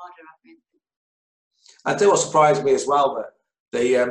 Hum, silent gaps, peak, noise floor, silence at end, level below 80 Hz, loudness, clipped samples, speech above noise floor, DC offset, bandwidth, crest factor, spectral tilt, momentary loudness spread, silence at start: none; 0.96-1.51 s, 3.60-3.72 s; -4 dBFS; under -90 dBFS; 0 s; -66 dBFS; -19 LUFS; under 0.1%; over 70 dB; under 0.1%; 11 kHz; 16 dB; -4 dB/octave; 13 LU; 0 s